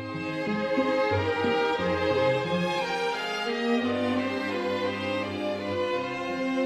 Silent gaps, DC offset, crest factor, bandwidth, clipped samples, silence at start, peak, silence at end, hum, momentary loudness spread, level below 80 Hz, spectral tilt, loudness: none; under 0.1%; 14 dB; 13 kHz; under 0.1%; 0 s; -12 dBFS; 0 s; none; 5 LU; -62 dBFS; -5.5 dB/octave; -27 LUFS